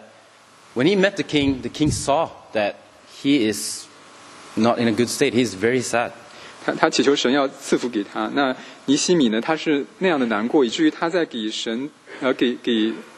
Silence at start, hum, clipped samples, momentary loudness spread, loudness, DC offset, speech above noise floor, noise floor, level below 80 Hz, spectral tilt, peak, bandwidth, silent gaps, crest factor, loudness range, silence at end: 0 s; none; under 0.1%; 10 LU; -21 LUFS; under 0.1%; 29 dB; -50 dBFS; -52 dBFS; -4 dB/octave; 0 dBFS; 13 kHz; none; 22 dB; 3 LU; 0.05 s